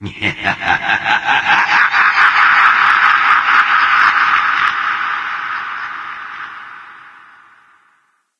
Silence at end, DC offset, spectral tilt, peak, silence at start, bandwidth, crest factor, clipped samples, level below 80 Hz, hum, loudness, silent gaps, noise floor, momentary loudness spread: 1.3 s; under 0.1%; -2.5 dB/octave; 0 dBFS; 0 s; 11 kHz; 14 dB; under 0.1%; -54 dBFS; none; -11 LUFS; none; -59 dBFS; 17 LU